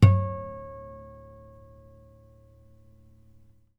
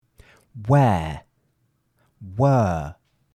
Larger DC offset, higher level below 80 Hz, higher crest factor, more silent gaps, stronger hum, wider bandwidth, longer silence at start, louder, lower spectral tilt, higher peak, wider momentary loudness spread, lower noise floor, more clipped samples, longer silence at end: neither; about the same, -50 dBFS vs -48 dBFS; first, 24 dB vs 18 dB; neither; neither; second, 5.6 kHz vs 9.4 kHz; second, 0 s vs 0.55 s; second, -28 LUFS vs -21 LUFS; about the same, -8.5 dB/octave vs -8.5 dB/octave; about the same, -4 dBFS vs -6 dBFS; first, 26 LU vs 19 LU; second, -56 dBFS vs -68 dBFS; neither; first, 2.9 s vs 0.45 s